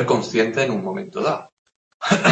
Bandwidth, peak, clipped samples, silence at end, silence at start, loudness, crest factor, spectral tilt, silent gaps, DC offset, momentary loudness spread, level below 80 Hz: 8.8 kHz; -2 dBFS; under 0.1%; 0 s; 0 s; -22 LUFS; 18 dB; -5 dB/octave; 1.52-1.66 s, 1.76-2.00 s; under 0.1%; 10 LU; -62 dBFS